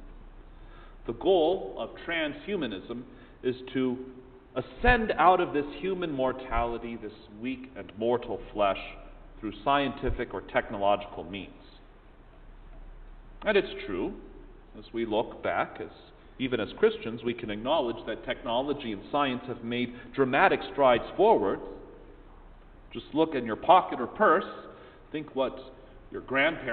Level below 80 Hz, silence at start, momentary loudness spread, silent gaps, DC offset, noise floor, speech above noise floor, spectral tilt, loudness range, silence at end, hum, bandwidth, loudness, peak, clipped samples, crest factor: -46 dBFS; 0 s; 18 LU; none; under 0.1%; -52 dBFS; 24 dB; -9.5 dB/octave; 7 LU; 0 s; none; 4.6 kHz; -29 LUFS; -6 dBFS; under 0.1%; 24 dB